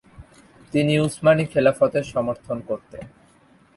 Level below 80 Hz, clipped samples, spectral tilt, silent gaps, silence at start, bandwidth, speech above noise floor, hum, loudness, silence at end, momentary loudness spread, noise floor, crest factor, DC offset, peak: -54 dBFS; under 0.1%; -6.5 dB/octave; none; 0.2 s; 11.5 kHz; 34 dB; none; -21 LUFS; 0.7 s; 13 LU; -55 dBFS; 18 dB; under 0.1%; -4 dBFS